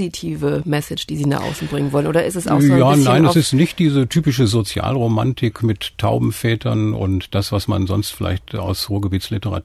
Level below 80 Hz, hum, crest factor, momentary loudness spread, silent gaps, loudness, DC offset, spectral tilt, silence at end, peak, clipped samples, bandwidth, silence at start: -42 dBFS; none; 14 dB; 10 LU; none; -18 LUFS; under 0.1%; -6 dB/octave; 0.05 s; -2 dBFS; under 0.1%; 14 kHz; 0 s